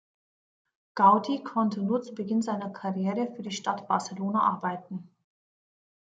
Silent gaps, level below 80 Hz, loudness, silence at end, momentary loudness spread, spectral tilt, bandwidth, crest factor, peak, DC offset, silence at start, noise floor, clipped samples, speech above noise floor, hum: none; -78 dBFS; -28 LUFS; 1 s; 12 LU; -6 dB/octave; 9.2 kHz; 22 dB; -6 dBFS; under 0.1%; 0.95 s; under -90 dBFS; under 0.1%; over 63 dB; none